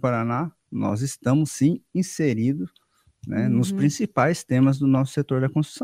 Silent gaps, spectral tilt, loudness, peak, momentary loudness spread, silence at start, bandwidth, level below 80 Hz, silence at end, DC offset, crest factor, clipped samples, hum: none; -7 dB/octave; -23 LUFS; -4 dBFS; 8 LU; 0.05 s; 15.5 kHz; -60 dBFS; 0 s; under 0.1%; 18 dB; under 0.1%; none